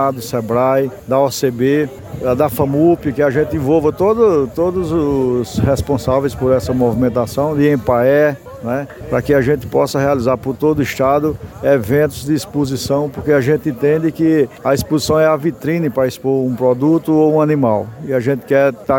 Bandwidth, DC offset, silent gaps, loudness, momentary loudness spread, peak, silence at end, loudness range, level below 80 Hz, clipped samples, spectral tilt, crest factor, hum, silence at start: 17 kHz; under 0.1%; none; -15 LUFS; 6 LU; -2 dBFS; 0 s; 1 LU; -40 dBFS; under 0.1%; -7 dB/octave; 14 dB; none; 0 s